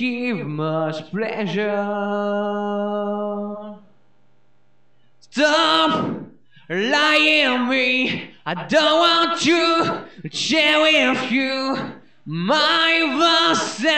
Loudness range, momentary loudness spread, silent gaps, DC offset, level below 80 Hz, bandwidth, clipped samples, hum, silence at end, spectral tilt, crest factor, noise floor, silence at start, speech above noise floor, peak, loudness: 8 LU; 13 LU; none; 0.3%; -70 dBFS; 12 kHz; under 0.1%; none; 0 s; -3.5 dB/octave; 14 dB; -64 dBFS; 0 s; 45 dB; -6 dBFS; -18 LUFS